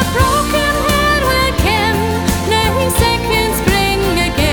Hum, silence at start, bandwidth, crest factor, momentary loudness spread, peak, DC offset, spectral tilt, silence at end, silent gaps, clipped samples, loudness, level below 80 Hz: none; 0 s; over 20 kHz; 14 dB; 2 LU; 0 dBFS; under 0.1%; -4 dB/octave; 0 s; none; under 0.1%; -13 LUFS; -22 dBFS